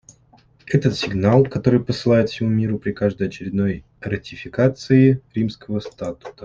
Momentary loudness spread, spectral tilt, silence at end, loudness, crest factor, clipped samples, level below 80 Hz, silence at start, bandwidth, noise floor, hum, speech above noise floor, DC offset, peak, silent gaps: 12 LU; -7.5 dB/octave; 0 s; -20 LUFS; 18 dB; under 0.1%; -50 dBFS; 0.65 s; 7.6 kHz; -54 dBFS; none; 35 dB; under 0.1%; -2 dBFS; none